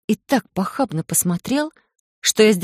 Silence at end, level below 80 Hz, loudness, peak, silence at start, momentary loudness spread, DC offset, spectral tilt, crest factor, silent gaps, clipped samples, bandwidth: 0 s; -58 dBFS; -20 LUFS; -2 dBFS; 0.1 s; 8 LU; under 0.1%; -4 dB/octave; 18 dB; 2.00-2.22 s; under 0.1%; 15.5 kHz